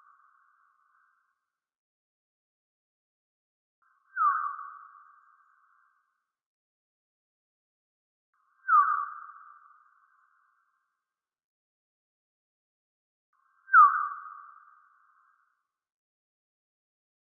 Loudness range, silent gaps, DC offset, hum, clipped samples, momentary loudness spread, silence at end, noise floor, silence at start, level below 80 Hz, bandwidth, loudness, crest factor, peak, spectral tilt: 10 LU; 6.46-8.33 s, 11.44-13.33 s; under 0.1%; none; under 0.1%; 27 LU; 2.8 s; -90 dBFS; 4.15 s; under -90 dBFS; 1.7 kHz; -24 LUFS; 26 dB; -8 dBFS; 19 dB/octave